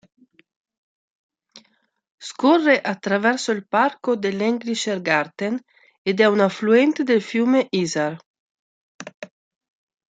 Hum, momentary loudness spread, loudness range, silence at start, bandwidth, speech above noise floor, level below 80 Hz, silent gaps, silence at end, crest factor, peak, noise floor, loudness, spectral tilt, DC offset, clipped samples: none; 20 LU; 3 LU; 1.55 s; 9.4 kHz; 45 dB; -72 dBFS; 2.11-2.18 s, 5.98-6.05 s, 8.26-8.34 s, 8.40-8.99 s, 9.14-9.22 s; 0.85 s; 20 dB; -2 dBFS; -65 dBFS; -20 LUFS; -5 dB/octave; under 0.1%; under 0.1%